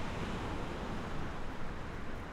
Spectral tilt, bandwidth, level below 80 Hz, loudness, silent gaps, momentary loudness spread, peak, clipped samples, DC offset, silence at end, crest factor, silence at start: -6 dB/octave; 11.5 kHz; -44 dBFS; -42 LUFS; none; 4 LU; -26 dBFS; under 0.1%; under 0.1%; 0 s; 12 dB; 0 s